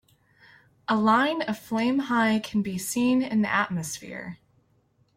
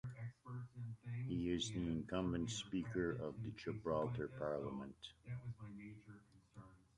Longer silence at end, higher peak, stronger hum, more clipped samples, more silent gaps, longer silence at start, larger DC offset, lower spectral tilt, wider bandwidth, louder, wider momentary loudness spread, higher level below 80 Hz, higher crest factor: first, 0.8 s vs 0.2 s; first, -10 dBFS vs -26 dBFS; neither; neither; neither; first, 0.9 s vs 0.05 s; neither; second, -4.5 dB/octave vs -6 dB/octave; first, 16.5 kHz vs 11 kHz; first, -25 LUFS vs -45 LUFS; about the same, 15 LU vs 17 LU; about the same, -64 dBFS vs -64 dBFS; about the same, 16 dB vs 18 dB